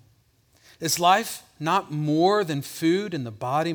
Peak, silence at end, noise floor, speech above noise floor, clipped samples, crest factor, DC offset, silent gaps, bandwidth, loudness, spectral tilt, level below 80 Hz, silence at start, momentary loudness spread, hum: -6 dBFS; 0 s; -62 dBFS; 38 dB; under 0.1%; 20 dB; under 0.1%; none; over 20 kHz; -24 LUFS; -4.5 dB/octave; -68 dBFS; 0.8 s; 11 LU; none